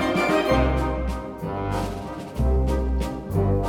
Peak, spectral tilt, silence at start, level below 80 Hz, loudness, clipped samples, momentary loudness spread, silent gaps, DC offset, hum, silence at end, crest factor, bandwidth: -8 dBFS; -7 dB/octave; 0 s; -28 dBFS; -25 LUFS; under 0.1%; 10 LU; none; under 0.1%; none; 0 s; 14 dB; 15 kHz